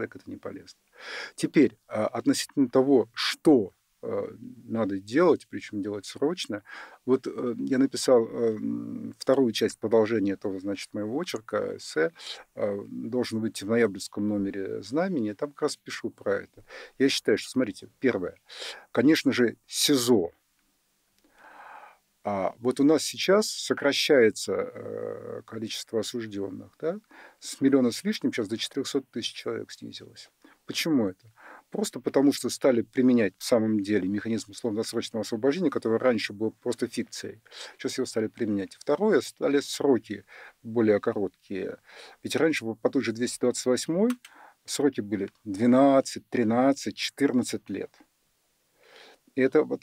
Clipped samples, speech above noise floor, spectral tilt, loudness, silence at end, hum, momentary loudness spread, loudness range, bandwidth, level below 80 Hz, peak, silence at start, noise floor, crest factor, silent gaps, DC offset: under 0.1%; 44 dB; -4.5 dB/octave; -27 LUFS; 0.05 s; none; 15 LU; 5 LU; 16 kHz; -72 dBFS; -10 dBFS; 0 s; -71 dBFS; 16 dB; none; under 0.1%